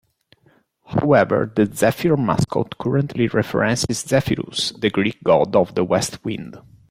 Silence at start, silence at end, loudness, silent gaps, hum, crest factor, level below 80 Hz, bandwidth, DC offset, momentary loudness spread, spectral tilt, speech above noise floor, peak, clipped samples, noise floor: 0.9 s; 0.3 s; -19 LUFS; none; none; 18 dB; -50 dBFS; 16.5 kHz; under 0.1%; 8 LU; -5.5 dB/octave; 40 dB; -2 dBFS; under 0.1%; -59 dBFS